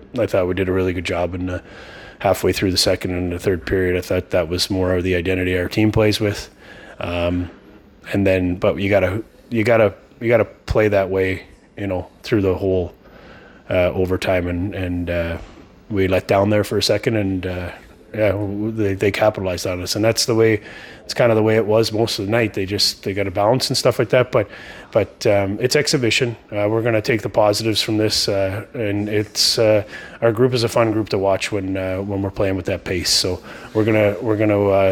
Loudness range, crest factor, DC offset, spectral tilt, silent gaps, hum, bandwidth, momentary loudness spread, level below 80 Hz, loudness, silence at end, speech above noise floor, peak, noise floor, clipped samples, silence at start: 3 LU; 16 dB; under 0.1%; -5 dB/octave; none; none; 18 kHz; 9 LU; -44 dBFS; -19 LUFS; 0 s; 24 dB; -2 dBFS; -43 dBFS; under 0.1%; 0 s